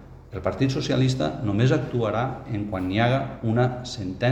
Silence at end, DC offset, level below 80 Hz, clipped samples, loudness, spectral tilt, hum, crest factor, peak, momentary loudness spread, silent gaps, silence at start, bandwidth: 0 s; under 0.1%; -46 dBFS; under 0.1%; -25 LUFS; -7 dB/octave; none; 18 dB; -6 dBFS; 8 LU; none; 0 s; 8.6 kHz